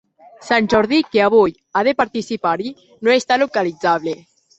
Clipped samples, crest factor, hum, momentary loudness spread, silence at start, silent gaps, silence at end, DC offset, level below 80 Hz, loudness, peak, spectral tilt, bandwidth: under 0.1%; 16 dB; none; 8 LU; 0.4 s; none; 0.45 s; under 0.1%; -54 dBFS; -17 LUFS; -2 dBFS; -5 dB/octave; 8.2 kHz